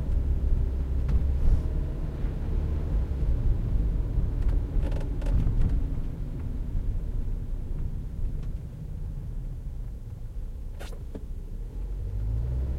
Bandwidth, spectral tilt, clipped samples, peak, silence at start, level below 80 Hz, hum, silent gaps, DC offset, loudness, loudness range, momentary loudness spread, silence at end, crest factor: 4.9 kHz; -9 dB/octave; under 0.1%; -12 dBFS; 0 s; -28 dBFS; none; none; under 0.1%; -32 LUFS; 9 LU; 12 LU; 0 s; 16 dB